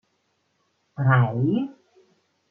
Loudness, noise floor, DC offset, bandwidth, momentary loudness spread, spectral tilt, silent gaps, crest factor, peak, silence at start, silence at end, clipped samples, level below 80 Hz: -23 LUFS; -71 dBFS; under 0.1%; 3.3 kHz; 15 LU; -10.5 dB/octave; none; 18 dB; -6 dBFS; 1 s; 0.8 s; under 0.1%; -68 dBFS